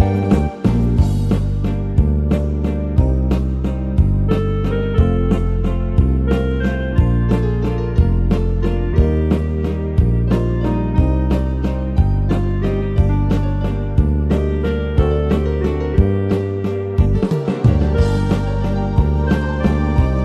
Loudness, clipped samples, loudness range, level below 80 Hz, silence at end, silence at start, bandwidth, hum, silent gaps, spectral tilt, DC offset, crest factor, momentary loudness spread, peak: -18 LUFS; under 0.1%; 1 LU; -20 dBFS; 0 s; 0 s; 8.2 kHz; none; none; -9 dB/octave; under 0.1%; 16 dB; 4 LU; 0 dBFS